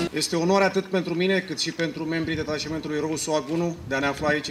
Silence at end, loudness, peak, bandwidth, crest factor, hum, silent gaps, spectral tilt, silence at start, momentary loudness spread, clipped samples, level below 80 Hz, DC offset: 0 s; -25 LUFS; -8 dBFS; 15 kHz; 16 dB; none; none; -4.5 dB/octave; 0 s; 7 LU; under 0.1%; -54 dBFS; under 0.1%